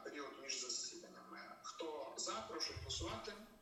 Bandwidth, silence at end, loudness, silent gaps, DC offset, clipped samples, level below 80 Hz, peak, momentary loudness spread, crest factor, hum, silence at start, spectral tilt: 16 kHz; 0 s; -46 LUFS; none; under 0.1%; under 0.1%; -64 dBFS; -30 dBFS; 12 LU; 18 dB; none; 0 s; -2 dB/octave